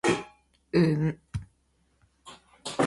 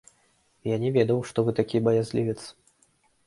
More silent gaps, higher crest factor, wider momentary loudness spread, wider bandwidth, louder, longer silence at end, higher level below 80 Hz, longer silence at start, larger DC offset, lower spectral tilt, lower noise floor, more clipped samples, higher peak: neither; about the same, 20 dB vs 20 dB; first, 25 LU vs 12 LU; about the same, 11.5 kHz vs 11.5 kHz; about the same, -28 LUFS vs -26 LUFS; second, 0 s vs 0.75 s; first, -54 dBFS vs -62 dBFS; second, 0.05 s vs 0.65 s; neither; second, -6 dB/octave vs -7.5 dB/octave; about the same, -69 dBFS vs -66 dBFS; neither; about the same, -10 dBFS vs -8 dBFS